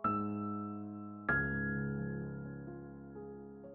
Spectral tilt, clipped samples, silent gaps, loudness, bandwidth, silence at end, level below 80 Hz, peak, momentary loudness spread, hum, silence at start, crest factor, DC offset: -8 dB/octave; under 0.1%; none; -39 LUFS; 3.9 kHz; 0 s; -58 dBFS; -20 dBFS; 15 LU; none; 0 s; 18 dB; under 0.1%